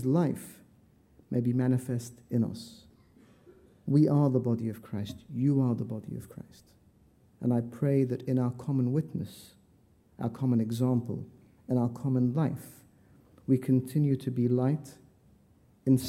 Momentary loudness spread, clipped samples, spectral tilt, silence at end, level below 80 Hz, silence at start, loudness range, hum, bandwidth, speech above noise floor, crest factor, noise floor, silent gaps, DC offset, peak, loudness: 16 LU; under 0.1%; -8.5 dB/octave; 0 s; -66 dBFS; 0 s; 3 LU; none; 15 kHz; 34 dB; 18 dB; -63 dBFS; none; under 0.1%; -12 dBFS; -30 LUFS